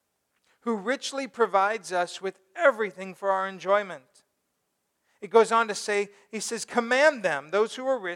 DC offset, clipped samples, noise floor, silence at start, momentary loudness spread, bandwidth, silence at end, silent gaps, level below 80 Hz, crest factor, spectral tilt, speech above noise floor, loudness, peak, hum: under 0.1%; under 0.1%; -77 dBFS; 0.65 s; 13 LU; 15.5 kHz; 0 s; none; -86 dBFS; 20 dB; -3 dB/octave; 51 dB; -26 LUFS; -6 dBFS; none